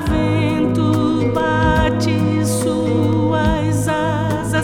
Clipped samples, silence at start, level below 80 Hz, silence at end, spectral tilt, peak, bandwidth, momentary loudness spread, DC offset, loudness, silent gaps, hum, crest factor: under 0.1%; 0 s; -30 dBFS; 0 s; -6.5 dB/octave; -2 dBFS; 15 kHz; 3 LU; under 0.1%; -17 LUFS; none; none; 14 dB